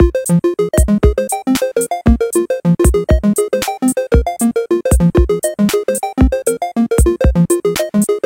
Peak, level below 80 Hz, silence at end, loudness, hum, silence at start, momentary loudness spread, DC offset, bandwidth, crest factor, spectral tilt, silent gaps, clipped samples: 0 dBFS; -20 dBFS; 0.05 s; -14 LUFS; none; 0 s; 4 LU; under 0.1%; 17 kHz; 14 dB; -6 dB/octave; none; under 0.1%